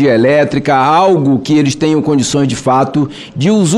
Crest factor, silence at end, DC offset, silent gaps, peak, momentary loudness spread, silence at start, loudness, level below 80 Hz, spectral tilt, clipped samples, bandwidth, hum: 10 dB; 0 s; under 0.1%; none; -2 dBFS; 5 LU; 0 s; -11 LUFS; -46 dBFS; -5.5 dB/octave; under 0.1%; 12 kHz; none